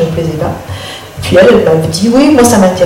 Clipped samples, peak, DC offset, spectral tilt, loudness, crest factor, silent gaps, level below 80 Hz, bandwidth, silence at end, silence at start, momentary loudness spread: 0.3%; 0 dBFS; under 0.1%; -5.5 dB/octave; -8 LUFS; 8 dB; none; -34 dBFS; 17 kHz; 0 s; 0 s; 16 LU